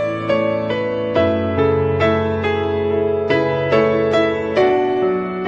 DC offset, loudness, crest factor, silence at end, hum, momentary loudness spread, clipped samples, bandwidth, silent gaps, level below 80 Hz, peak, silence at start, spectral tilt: under 0.1%; -17 LUFS; 14 dB; 0 s; none; 4 LU; under 0.1%; 7.4 kHz; none; -48 dBFS; -2 dBFS; 0 s; -7.5 dB/octave